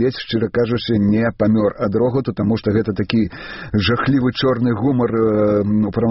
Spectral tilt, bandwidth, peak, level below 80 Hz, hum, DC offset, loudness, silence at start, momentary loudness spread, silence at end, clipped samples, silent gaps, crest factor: -6 dB/octave; 5.8 kHz; -2 dBFS; -44 dBFS; none; under 0.1%; -18 LUFS; 0 s; 3 LU; 0 s; under 0.1%; none; 16 dB